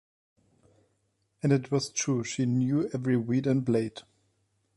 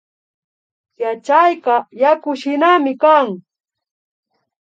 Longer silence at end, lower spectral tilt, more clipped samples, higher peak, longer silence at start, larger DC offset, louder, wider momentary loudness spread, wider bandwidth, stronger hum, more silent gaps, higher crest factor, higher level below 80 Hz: second, 0.75 s vs 1.3 s; about the same, -6 dB/octave vs -5 dB/octave; neither; second, -12 dBFS vs 0 dBFS; first, 1.45 s vs 1 s; neither; second, -28 LUFS vs -15 LUFS; second, 4 LU vs 11 LU; first, 11.5 kHz vs 7.8 kHz; neither; neither; about the same, 18 dB vs 16 dB; first, -68 dBFS vs -80 dBFS